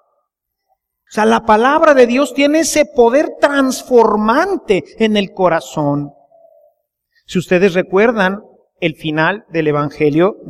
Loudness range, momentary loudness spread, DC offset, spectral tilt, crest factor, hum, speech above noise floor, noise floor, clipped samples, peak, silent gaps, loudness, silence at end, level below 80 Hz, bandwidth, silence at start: 6 LU; 9 LU; under 0.1%; -5 dB/octave; 14 dB; none; 60 dB; -73 dBFS; under 0.1%; 0 dBFS; none; -13 LUFS; 0 s; -48 dBFS; 15 kHz; 1.1 s